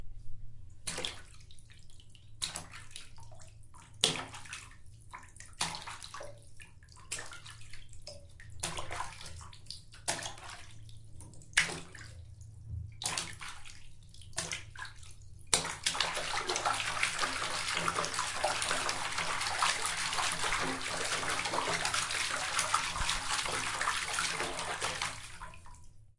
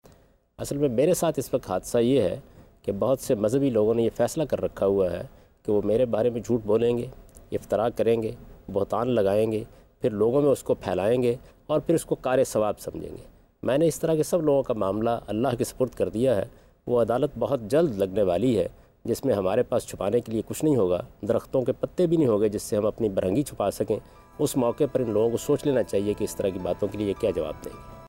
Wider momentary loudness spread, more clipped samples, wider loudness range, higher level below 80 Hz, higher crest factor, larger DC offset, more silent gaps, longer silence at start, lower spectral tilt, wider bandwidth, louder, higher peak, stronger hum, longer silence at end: first, 22 LU vs 10 LU; neither; first, 11 LU vs 1 LU; about the same, -54 dBFS vs -52 dBFS; first, 30 dB vs 14 dB; neither; neither; second, 0 s vs 0.6 s; second, -1 dB/octave vs -6.5 dB/octave; second, 11.5 kHz vs 16 kHz; second, -34 LUFS vs -25 LUFS; first, -6 dBFS vs -12 dBFS; neither; about the same, 0.05 s vs 0 s